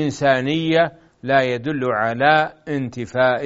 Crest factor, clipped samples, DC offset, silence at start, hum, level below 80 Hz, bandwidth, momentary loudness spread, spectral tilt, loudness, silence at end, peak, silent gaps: 18 dB; under 0.1%; under 0.1%; 0 s; none; -56 dBFS; 8 kHz; 9 LU; -4 dB/octave; -19 LUFS; 0 s; 0 dBFS; none